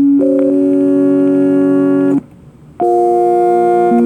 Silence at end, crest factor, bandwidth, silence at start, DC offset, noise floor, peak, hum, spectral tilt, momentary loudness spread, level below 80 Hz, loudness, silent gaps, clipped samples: 0 s; 8 dB; 9.2 kHz; 0 s; under 0.1%; -38 dBFS; -2 dBFS; none; -9 dB/octave; 3 LU; -52 dBFS; -12 LUFS; none; under 0.1%